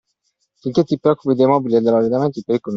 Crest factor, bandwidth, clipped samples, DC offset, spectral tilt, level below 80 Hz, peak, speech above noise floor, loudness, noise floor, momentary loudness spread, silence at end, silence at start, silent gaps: 16 dB; 7.4 kHz; under 0.1%; under 0.1%; -8.5 dB/octave; -60 dBFS; -2 dBFS; 53 dB; -17 LUFS; -69 dBFS; 6 LU; 0 s; 0.65 s; none